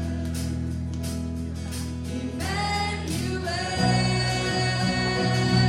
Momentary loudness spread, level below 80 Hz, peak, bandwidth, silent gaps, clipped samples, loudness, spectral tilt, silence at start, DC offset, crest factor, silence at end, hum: 9 LU; -38 dBFS; -8 dBFS; 15.5 kHz; none; under 0.1%; -26 LUFS; -5 dB/octave; 0 s; under 0.1%; 18 dB; 0 s; none